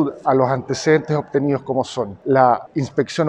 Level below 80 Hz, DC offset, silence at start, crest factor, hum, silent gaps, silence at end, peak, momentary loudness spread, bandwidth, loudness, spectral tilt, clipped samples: -58 dBFS; under 0.1%; 0 s; 18 dB; none; none; 0 s; 0 dBFS; 7 LU; 10.5 kHz; -19 LUFS; -6.5 dB/octave; under 0.1%